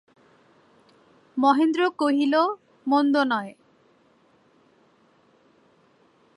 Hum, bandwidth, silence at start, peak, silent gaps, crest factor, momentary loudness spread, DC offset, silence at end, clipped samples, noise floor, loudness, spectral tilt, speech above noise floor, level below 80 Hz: none; 11 kHz; 1.35 s; -8 dBFS; none; 18 dB; 12 LU; under 0.1%; 2.85 s; under 0.1%; -61 dBFS; -22 LUFS; -5 dB/octave; 40 dB; -82 dBFS